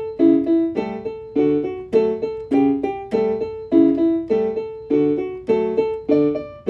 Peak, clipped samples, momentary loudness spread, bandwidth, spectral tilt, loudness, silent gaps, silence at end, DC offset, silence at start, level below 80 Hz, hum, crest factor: -4 dBFS; under 0.1%; 9 LU; 5.8 kHz; -9 dB/octave; -20 LUFS; none; 0 s; under 0.1%; 0 s; -52 dBFS; none; 16 dB